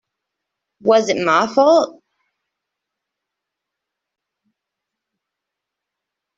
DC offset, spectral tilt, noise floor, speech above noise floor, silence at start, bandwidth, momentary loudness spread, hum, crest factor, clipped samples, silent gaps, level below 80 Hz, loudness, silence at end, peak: under 0.1%; -4 dB/octave; -83 dBFS; 68 dB; 0.85 s; 7.6 kHz; 8 LU; none; 20 dB; under 0.1%; none; -68 dBFS; -15 LUFS; 4.45 s; -2 dBFS